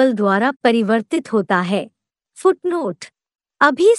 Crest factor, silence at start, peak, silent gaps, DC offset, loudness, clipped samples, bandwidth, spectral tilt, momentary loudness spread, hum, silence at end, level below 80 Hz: 18 dB; 0 s; 0 dBFS; 0.56-0.60 s; under 0.1%; -18 LUFS; under 0.1%; 12 kHz; -5.5 dB/octave; 11 LU; none; 0 s; -72 dBFS